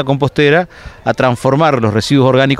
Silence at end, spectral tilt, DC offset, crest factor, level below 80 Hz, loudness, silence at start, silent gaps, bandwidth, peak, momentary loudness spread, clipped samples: 0 s; -6.5 dB/octave; under 0.1%; 12 dB; -42 dBFS; -12 LUFS; 0 s; none; 13 kHz; 0 dBFS; 8 LU; under 0.1%